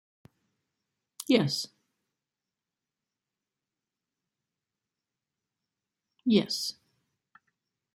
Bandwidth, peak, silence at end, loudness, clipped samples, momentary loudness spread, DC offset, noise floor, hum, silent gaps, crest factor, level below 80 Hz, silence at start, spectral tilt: 16 kHz; -10 dBFS; 1.2 s; -28 LUFS; under 0.1%; 13 LU; under 0.1%; -90 dBFS; none; none; 24 dB; -76 dBFS; 1.2 s; -5 dB/octave